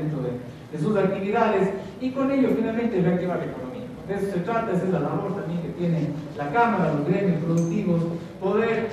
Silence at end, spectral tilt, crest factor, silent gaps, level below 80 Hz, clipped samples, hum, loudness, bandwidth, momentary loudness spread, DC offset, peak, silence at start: 0 s; -8 dB/octave; 16 dB; none; -54 dBFS; under 0.1%; none; -24 LUFS; 11.5 kHz; 9 LU; under 0.1%; -8 dBFS; 0 s